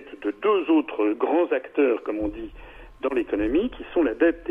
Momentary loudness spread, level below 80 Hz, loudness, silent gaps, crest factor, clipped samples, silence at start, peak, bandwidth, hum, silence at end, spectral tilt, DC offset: 10 LU; -46 dBFS; -24 LUFS; none; 16 dB; under 0.1%; 0 s; -8 dBFS; 3.7 kHz; none; 0 s; -7.5 dB/octave; under 0.1%